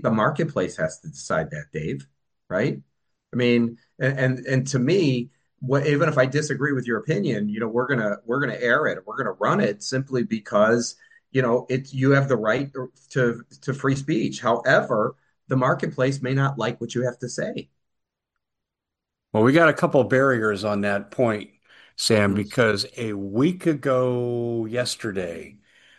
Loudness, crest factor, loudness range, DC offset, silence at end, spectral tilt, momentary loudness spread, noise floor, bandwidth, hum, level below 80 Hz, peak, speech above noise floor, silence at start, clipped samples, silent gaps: -23 LUFS; 20 dB; 5 LU; under 0.1%; 0.5 s; -6 dB/octave; 10 LU; -85 dBFS; 12.5 kHz; none; -62 dBFS; -4 dBFS; 63 dB; 0 s; under 0.1%; none